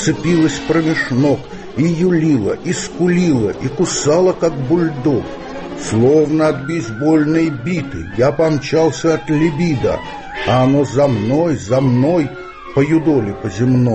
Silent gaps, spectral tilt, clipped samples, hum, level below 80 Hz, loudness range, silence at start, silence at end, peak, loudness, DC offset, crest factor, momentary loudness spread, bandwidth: none; -6.5 dB/octave; under 0.1%; none; -42 dBFS; 1 LU; 0 s; 0 s; -2 dBFS; -15 LUFS; under 0.1%; 12 dB; 8 LU; 8.6 kHz